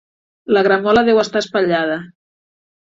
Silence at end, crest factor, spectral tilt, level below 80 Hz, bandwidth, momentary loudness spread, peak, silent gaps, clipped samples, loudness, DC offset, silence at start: 0.8 s; 14 dB; -5 dB/octave; -50 dBFS; 7.8 kHz; 10 LU; -2 dBFS; none; under 0.1%; -16 LUFS; under 0.1%; 0.5 s